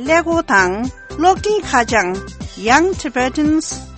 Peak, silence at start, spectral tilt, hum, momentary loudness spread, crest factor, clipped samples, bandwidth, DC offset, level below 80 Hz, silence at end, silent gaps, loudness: 0 dBFS; 0 s; -4 dB/octave; none; 10 LU; 16 dB; under 0.1%; 8.8 kHz; under 0.1%; -36 dBFS; 0 s; none; -16 LUFS